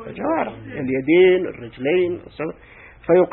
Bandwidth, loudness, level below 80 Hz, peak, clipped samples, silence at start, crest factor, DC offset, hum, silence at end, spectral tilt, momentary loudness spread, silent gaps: 4.1 kHz; -20 LUFS; -52 dBFS; -4 dBFS; under 0.1%; 0 s; 16 dB; under 0.1%; none; 0 s; -11.5 dB/octave; 16 LU; none